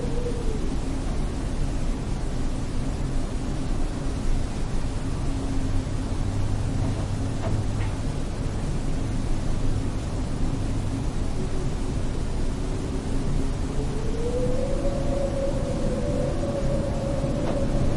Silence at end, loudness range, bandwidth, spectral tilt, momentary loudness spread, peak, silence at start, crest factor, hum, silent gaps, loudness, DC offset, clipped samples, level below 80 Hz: 0 s; 3 LU; 11.5 kHz; -6.5 dB/octave; 4 LU; -12 dBFS; 0 s; 12 dB; none; none; -29 LUFS; under 0.1%; under 0.1%; -28 dBFS